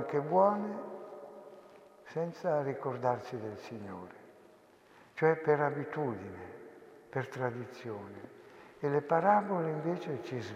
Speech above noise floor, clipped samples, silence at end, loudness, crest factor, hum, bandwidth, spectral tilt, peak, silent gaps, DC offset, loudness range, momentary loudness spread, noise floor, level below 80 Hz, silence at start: 28 dB; under 0.1%; 0 s; -33 LUFS; 22 dB; none; 12.5 kHz; -8 dB/octave; -12 dBFS; none; under 0.1%; 4 LU; 23 LU; -61 dBFS; -80 dBFS; 0 s